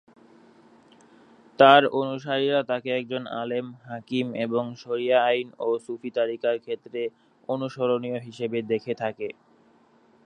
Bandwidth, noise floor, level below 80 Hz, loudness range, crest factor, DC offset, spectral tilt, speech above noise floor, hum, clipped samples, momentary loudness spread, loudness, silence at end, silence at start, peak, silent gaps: 9.8 kHz; -59 dBFS; -76 dBFS; 7 LU; 24 dB; under 0.1%; -6 dB/octave; 34 dB; none; under 0.1%; 14 LU; -25 LUFS; 0.95 s; 1.6 s; -2 dBFS; none